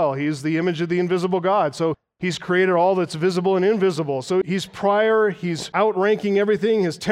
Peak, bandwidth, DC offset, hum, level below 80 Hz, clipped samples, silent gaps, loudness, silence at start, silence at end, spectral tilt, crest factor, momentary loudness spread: -6 dBFS; 12.5 kHz; under 0.1%; none; -64 dBFS; under 0.1%; none; -20 LUFS; 0 s; 0 s; -6 dB/octave; 14 dB; 7 LU